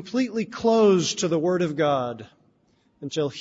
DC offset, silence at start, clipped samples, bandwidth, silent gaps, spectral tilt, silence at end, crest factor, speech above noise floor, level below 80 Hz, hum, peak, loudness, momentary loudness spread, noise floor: under 0.1%; 0 s; under 0.1%; 8 kHz; none; -5 dB/octave; 0 s; 14 dB; 41 dB; -66 dBFS; none; -8 dBFS; -23 LUFS; 14 LU; -64 dBFS